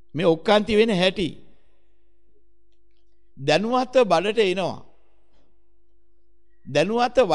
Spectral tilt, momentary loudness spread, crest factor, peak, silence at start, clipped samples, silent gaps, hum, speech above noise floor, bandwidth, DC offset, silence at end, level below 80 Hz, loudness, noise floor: -5.5 dB/octave; 11 LU; 20 dB; -4 dBFS; 0.15 s; under 0.1%; none; none; 46 dB; 11.5 kHz; 0.8%; 0 s; -54 dBFS; -21 LUFS; -66 dBFS